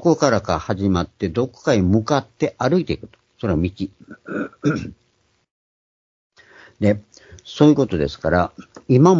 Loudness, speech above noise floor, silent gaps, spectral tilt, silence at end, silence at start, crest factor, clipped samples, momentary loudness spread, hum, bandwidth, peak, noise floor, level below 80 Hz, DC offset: -20 LUFS; 30 dB; 5.51-6.30 s; -7 dB/octave; 0 s; 0 s; 20 dB; under 0.1%; 13 LU; none; 7.6 kHz; 0 dBFS; -48 dBFS; -44 dBFS; under 0.1%